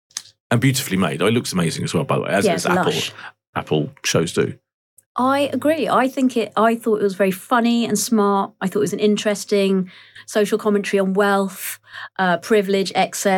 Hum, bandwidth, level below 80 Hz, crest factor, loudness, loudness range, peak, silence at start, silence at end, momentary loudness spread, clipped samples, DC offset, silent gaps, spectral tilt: none; 19.5 kHz; -62 dBFS; 14 dB; -19 LUFS; 2 LU; -4 dBFS; 0.15 s; 0 s; 9 LU; under 0.1%; under 0.1%; 0.40-0.50 s, 3.47-3.53 s, 4.74-4.97 s, 5.06-5.15 s; -5 dB/octave